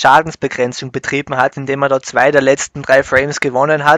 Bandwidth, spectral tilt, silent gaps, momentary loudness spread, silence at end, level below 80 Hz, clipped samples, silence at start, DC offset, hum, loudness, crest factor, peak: 12.5 kHz; -4 dB/octave; none; 8 LU; 0 s; -48 dBFS; 0.5%; 0 s; under 0.1%; none; -14 LUFS; 14 dB; 0 dBFS